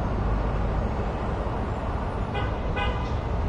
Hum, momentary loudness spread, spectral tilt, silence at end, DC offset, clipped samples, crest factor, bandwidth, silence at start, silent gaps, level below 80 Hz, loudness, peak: none; 2 LU; -7.5 dB/octave; 0 s; under 0.1%; under 0.1%; 12 dB; 8 kHz; 0 s; none; -30 dBFS; -29 LUFS; -14 dBFS